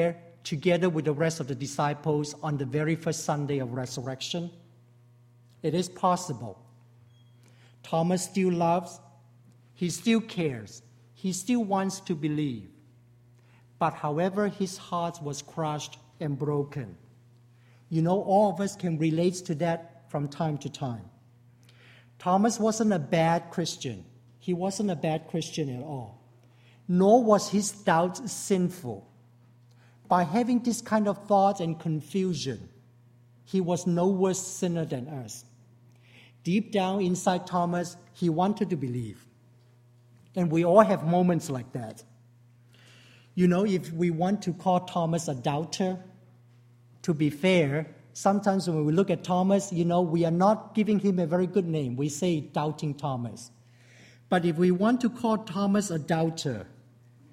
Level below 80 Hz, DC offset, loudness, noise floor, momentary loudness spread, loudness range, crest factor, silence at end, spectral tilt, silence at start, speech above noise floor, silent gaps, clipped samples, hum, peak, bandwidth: -66 dBFS; under 0.1%; -27 LUFS; -58 dBFS; 13 LU; 6 LU; 24 dB; 0.65 s; -6 dB/octave; 0 s; 31 dB; none; under 0.1%; none; -4 dBFS; 15 kHz